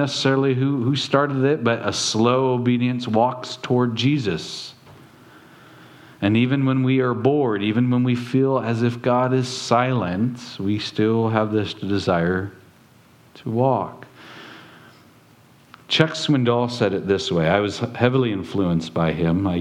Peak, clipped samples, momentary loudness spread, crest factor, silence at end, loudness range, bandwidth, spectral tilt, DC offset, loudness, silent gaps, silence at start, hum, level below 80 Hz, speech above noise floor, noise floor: 0 dBFS; under 0.1%; 8 LU; 22 dB; 0 s; 5 LU; 11 kHz; -6 dB/octave; under 0.1%; -21 LUFS; none; 0 s; none; -54 dBFS; 32 dB; -52 dBFS